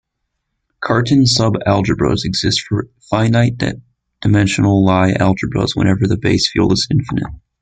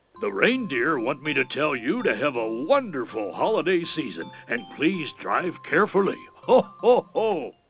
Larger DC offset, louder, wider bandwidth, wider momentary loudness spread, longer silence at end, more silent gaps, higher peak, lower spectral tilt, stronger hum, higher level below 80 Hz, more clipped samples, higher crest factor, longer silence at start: neither; first, -15 LUFS vs -24 LUFS; first, 9.4 kHz vs 4 kHz; about the same, 10 LU vs 10 LU; about the same, 0.25 s vs 0.2 s; neither; first, -2 dBFS vs -6 dBFS; second, -5.5 dB/octave vs -9.5 dB/octave; neither; first, -38 dBFS vs -72 dBFS; neither; about the same, 14 dB vs 18 dB; first, 0.8 s vs 0.15 s